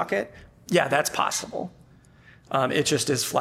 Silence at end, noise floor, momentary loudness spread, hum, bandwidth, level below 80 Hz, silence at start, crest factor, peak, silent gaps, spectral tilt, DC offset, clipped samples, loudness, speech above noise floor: 0 s; -53 dBFS; 14 LU; none; 17 kHz; -60 dBFS; 0 s; 20 dB; -6 dBFS; none; -3.5 dB/octave; under 0.1%; under 0.1%; -25 LUFS; 28 dB